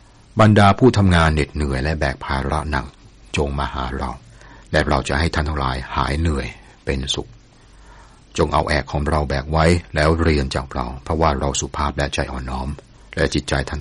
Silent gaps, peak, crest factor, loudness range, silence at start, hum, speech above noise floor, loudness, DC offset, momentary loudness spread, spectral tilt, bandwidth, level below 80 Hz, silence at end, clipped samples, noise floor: none; -2 dBFS; 16 dB; 5 LU; 0.35 s; none; 28 dB; -20 LUFS; under 0.1%; 13 LU; -5.5 dB/octave; 11.5 kHz; -28 dBFS; 0 s; under 0.1%; -46 dBFS